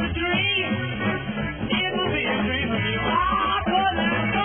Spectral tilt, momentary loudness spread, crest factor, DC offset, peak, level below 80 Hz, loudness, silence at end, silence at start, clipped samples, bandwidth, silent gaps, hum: -9 dB/octave; 5 LU; 14 dB; 0.2%; -10 dBFS; -40 dBFS; -23 LUFS; 0 s; 0 s; under 0.1%; 3.5 kHz; none; none